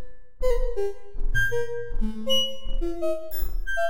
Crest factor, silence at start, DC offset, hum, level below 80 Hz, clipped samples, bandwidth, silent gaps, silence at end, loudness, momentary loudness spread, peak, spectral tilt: 14 dB; 0 s; 5%; none; -28 dBFS; under 0.1%; 16 kHz; none; 0 s; -28 LUFS; 9 LU; -10 dBFS; -3.5 dB/octave